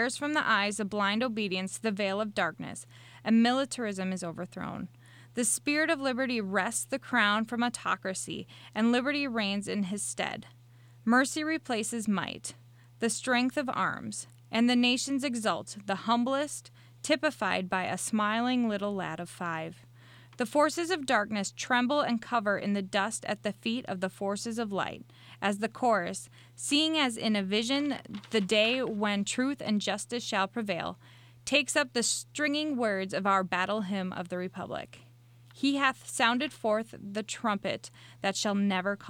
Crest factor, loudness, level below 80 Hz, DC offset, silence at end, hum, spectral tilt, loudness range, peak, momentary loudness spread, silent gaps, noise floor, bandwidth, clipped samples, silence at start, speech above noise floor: 20 dB; -30 LUFS; -72 dBFS; under 0.1%; 0 s; none; -3.5 dB/octave; 3 LU; -10 dBFS; 12 LU; none; -56 dBFS; 16.5 kHz; under 0.1%; 0 s; 26 dB